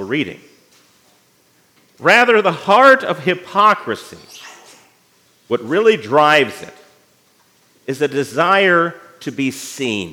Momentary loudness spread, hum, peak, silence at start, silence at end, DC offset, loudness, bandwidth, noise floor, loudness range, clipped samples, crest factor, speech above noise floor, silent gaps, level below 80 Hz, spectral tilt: 19 LU; none; 0 dBFS; 0 s; 0 s; under 0.1%; -14 LUFS; 17 kHz; -56 dBFS; 4 LU; under 0.1%; 16 dB; 41 dB; none; -70 dBFS; -4.5 dB/octave